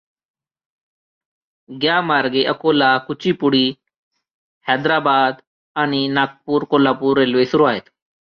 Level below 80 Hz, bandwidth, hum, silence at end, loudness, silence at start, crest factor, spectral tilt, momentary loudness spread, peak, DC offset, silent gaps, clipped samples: -62 dBFS; 6.6 kHz; none; 0.55 s; -17 LUFS; 1.7 s; 16 dB; -6.5 dB/octave; 6 LU; -2 dBFS; under 0.1%; 3.97-4.11 s, 4.34-4.61 s, 5.47-5.75 s; under 0.1%